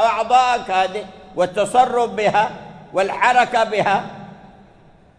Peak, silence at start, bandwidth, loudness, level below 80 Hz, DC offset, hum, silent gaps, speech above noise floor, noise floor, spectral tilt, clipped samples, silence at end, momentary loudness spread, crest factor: -2 dBFS; 0 s; 11 kHz; -18 LUFS; -54 dBFS; under 0.1%; none; none; 31 dB; -49 dBFS; -4 dB/octave; under 0.1%; 0.85 s; 15 LU; 18 dB